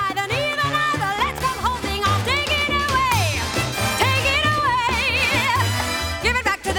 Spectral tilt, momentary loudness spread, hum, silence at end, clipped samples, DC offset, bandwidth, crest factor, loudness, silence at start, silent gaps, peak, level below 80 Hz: -3.5 dB/octave; 4 LU; none; 0 s; under 0.1%; under 0.1%; over 20 kHz; 14 dB; -19 LUFS; 0 s; none; -6 dBFS; -36 dBFS